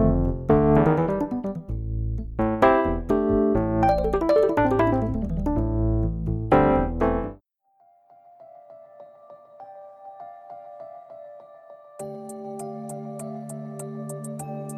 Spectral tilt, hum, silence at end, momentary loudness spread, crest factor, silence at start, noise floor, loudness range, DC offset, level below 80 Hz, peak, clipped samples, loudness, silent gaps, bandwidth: -8 dB/octave; none; 0 s; 23 LU; 20 dB; 0 s; -63 dBFS; 22 LU; under 0.1%; -34 dBFS; -4 dBFS; under 0.1%; -23 LUFS; none; 14 kHz